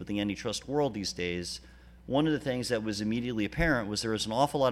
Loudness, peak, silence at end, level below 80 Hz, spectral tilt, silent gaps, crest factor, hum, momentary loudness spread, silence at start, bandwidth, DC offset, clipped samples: -31 LUFS; -12 dBFS; 0 s; -48 dBFS; -4.5 dB/octave; none; 20 dB; none; 6 LU; 0 s; 15.5 kHz; under 0.1%; under 0.1%